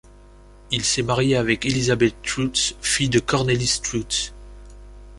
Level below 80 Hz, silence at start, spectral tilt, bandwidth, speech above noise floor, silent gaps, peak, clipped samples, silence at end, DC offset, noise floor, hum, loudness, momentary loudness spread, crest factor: -42 dBFS; 0.7 s; -3.5 dB/octave; 11.5 kHz; 25 dB; none; -4 dBFS; under 0.1%; 0 s; under 0.1%; -46 dBFS; 50 Hz at -40 dBFS; -21 LUFS; 5 LU; 18 dB